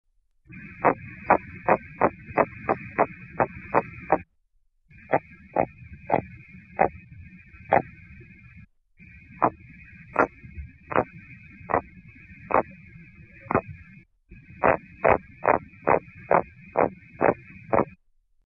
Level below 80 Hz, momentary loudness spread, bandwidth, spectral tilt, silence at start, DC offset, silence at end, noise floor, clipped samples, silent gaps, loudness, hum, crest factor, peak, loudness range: -52 dBFS; 23 LU; 6.4 kHz; -10 dB/octave; 0.55 s; under 0.1%; 0.65 s; -67 dBFS; under 0.1%; none; -26 LUFS; none; 22 dB; -4 dBFS; 6 LU